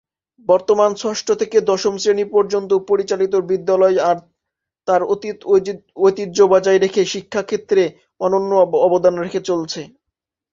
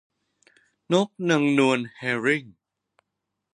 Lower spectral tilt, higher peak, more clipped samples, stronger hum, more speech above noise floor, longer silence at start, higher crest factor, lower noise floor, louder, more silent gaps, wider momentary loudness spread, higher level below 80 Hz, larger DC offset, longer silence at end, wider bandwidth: about the same, -4.5 dB/octave vs -5.5 dB/octave; first, 0 dBFS vs -6 dBFS; neither; neither; first, 65 dB vs 59 dB; second, 0.5 s vs 0.9 s; about the same, 16 dB vs 20 dB; about the same, -82 dBFS vs -82 dBFS; first, -17 LUFS vs -23 LUFS; neither; about the same, 9 LU vs 7 LU; first, -62 dBFS vs -76 dBFS; neither; second, 0.65 s vs 1.05 s; second, 7.6 kHz vs 10 kHz